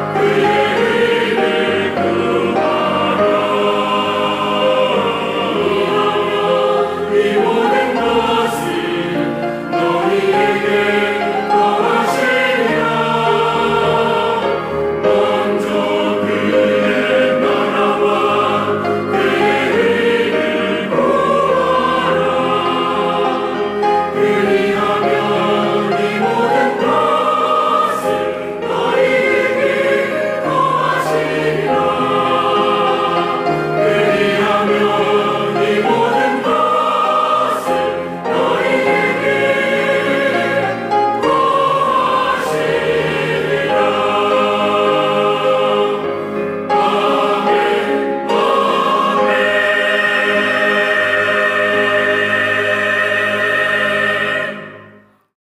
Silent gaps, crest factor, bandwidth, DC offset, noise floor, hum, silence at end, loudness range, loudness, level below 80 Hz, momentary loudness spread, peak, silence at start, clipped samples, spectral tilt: none; 12 dB; 15.5 kHz; under 0.1%; -45 dBFS; none; 0.55 s; 2 LU; -14 LUFS; -54 dBFS; 4 LU; -4 dBFS; 0 s; under 0.1%; -5 dB/octave